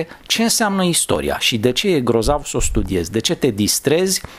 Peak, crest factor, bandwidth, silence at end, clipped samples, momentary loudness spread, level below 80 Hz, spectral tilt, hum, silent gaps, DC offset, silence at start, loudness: -2 dBFS; 16 dB; 16.5 kHz; 0 s; under 0.1%; 5 LU; -30 dBFS; -3.5 dB/octave; none; none; under 0.1%; 0 s; -17 LUFS